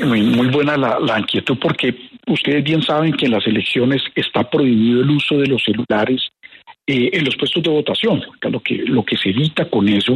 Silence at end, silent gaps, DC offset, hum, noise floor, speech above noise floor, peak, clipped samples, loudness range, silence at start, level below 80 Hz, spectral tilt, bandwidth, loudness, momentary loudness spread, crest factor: 0 s; none; under 0.1%; none; -43 dBFS; 27 dB; -4 dBFS; under 0.1%; 2 LU; 0 s; -56 dBFS; -7 dB/octave; 11.5 kHz; -16 LUFS; 6 LU; 12 dB